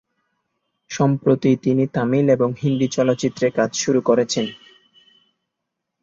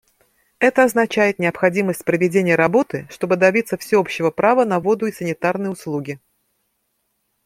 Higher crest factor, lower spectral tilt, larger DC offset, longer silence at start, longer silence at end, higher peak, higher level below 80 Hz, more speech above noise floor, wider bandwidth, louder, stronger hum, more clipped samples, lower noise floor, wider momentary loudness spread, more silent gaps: about the same, 18 dB vs 18 dB; about the same, -6 dB/octave vs -6 dB/octave; neither; first, 0.9 s vs 0.6 s; first, 1.45 s vs 1.3 s; about the same, -2 dBFS vs -2 dBFS; about the same, -60 dBFS vs -62 dBFS; first, 62 dB vs 52 dB; second, 7.8 kHz vs 16 kHz; about the same, -19 LUFS vs -18 LUFS; neither; neither; first, -80 dBFS vs -70 dBFS; second, 4 LU vs 10 LU; neither